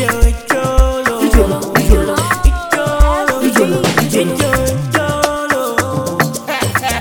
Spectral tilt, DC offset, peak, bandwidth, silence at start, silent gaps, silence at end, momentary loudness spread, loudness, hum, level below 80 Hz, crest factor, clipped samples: -5 dB/octave; under 0.1%; 0 dBFS; 19.5 kHz; 0 s; none; 0 s; 4 LU; -14 LUFS; none; -16 dBFS; 12 dB; 0.5%